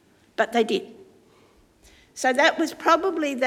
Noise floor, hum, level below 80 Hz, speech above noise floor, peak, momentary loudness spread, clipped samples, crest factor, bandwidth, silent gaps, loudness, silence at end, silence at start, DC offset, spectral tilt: -57 dBFS; none; -66 dBFS; 35 dB; -4 dBFS; 17 LU; under 0.1%; 20 dB; 17 kHz; none; -22 LUFS; 0 s; 0.4 s; under 0.1%; -2.5 dB/octave